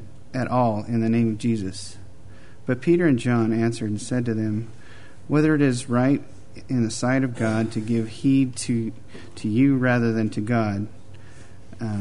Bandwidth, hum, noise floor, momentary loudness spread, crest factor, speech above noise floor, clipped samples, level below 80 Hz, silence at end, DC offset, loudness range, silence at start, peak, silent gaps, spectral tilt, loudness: 11 kHz; none; -46 dBFS; 13 LU; 16 dB; 24 dB; under 0.1%; -54 dBFS; 0 s; 1%; 2 LU; 0 s; -8 dBFS; none; -6.5 dB/octave; -23 LUFS